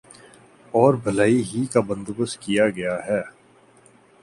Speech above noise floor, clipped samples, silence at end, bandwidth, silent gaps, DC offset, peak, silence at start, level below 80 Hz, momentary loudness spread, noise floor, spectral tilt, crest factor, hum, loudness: 33 dB; under 0.1%; 0.95 s; 11.5 kHz; none; under 0.1%; -2 dBFS; 0.75 s; -58 dBFS; 9 LU; -54 dBFS; -6 dB/octave; 22 dB; none; -22 LUFS